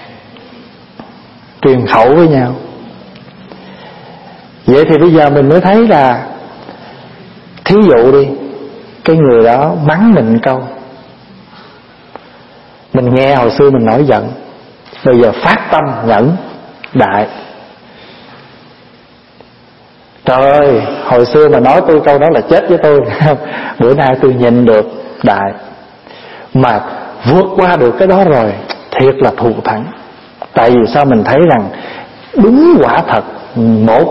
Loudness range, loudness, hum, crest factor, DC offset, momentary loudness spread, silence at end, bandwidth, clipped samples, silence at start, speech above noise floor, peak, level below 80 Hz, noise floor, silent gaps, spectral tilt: 6 LU; -9 LUFS; none; 10 dB; under 0.1%; 16 LU; 0 s; 6 kHz; 0.5%; 0 s; 33 dB; 0 dBFS; -42 dBFS; -41 dBFS; none; -9 dB/octave